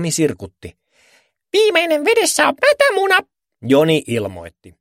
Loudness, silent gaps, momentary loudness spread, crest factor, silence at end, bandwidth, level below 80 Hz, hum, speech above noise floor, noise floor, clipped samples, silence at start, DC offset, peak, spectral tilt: -15 LUFS; none; 17 LU; 18 dB; 0.3 s; 16.5 kHz; -56 dBFS; none; 41 dB; -57 dBFS; under 0.1%; 0 s; under 0.1%; 0 dBFS; -3.5 dB/octave